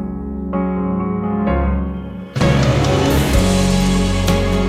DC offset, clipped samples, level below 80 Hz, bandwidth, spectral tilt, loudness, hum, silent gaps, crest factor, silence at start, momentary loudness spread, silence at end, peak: under 0.1%; under 0.1%; -24 dBFS; 16 kHz; -6 dB/octave; -17 LUFS; none; none; 14 dB; 0 s; 10 LU; 0 s; -2 dBFS